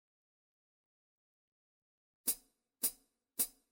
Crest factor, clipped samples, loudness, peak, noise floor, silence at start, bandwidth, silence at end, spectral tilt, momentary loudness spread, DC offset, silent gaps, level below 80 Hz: 26 dB; under 0.1%; -38 LUFS; -20 dBFS; -62 dBFS; 2.25 s; 17 kHz; 0.25 s; 0.5 dB/octave; 4 LU; under 0.1%; none; -80 dBFS